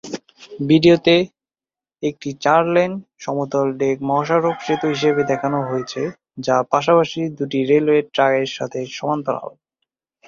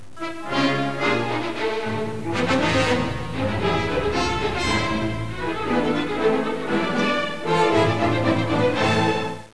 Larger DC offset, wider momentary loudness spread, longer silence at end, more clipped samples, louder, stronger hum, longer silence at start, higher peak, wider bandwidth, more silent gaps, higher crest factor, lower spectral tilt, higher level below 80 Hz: second, under 0.1% vs 2%; first, 12 LU vs 7 LU; first, 0.8 s vs 0 s; neither; first, -19 LUFS vs -22 LUFS; neither; about the same, 0.05 s vs 0 s; first, 0 dBFS vs -8 dBFS; second, 7.4 kHz vs 11 kHz; neither; about the same, 18 dB vs 14 dB; about the same, -6 dB/octave vs -5.5 dB/octave; second, -60 dBFS vs -42 dBFS